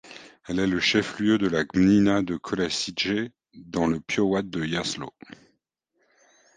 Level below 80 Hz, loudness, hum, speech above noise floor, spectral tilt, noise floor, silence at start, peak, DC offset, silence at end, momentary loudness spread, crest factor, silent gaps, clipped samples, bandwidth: -54 dBFS; -24 LUFS; none; 50 dB; -5 dB/octave; -74 dBFS; 0.05 s; -8 dBFS; under 0.1%; 1.5 s; 13 LU; 18 dB; none; under 0.1%; 9.6 kHz